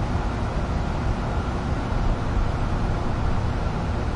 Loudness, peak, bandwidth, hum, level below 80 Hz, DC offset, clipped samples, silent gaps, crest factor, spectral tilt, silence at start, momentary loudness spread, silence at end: -26 LUFS; -12 dBFS; 10.5 kHz; none; -26 dBFS; under 0.1%; under 0.1%; none; 12 dB; -7 dB/octave; 0 s; 1 LU; 0 s